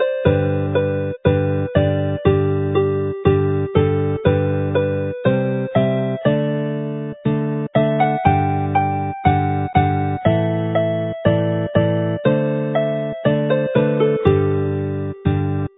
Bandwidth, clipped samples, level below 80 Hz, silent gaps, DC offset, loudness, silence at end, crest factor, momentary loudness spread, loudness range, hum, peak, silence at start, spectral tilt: 4 kHz; under 0.1%; -36 dBFS; none; under 0.1%; -19 LUFS; 0.1 s; 18 dB; 5 LU; 1 LU; none; 0 dBFS; 0 s; -12 dB/octave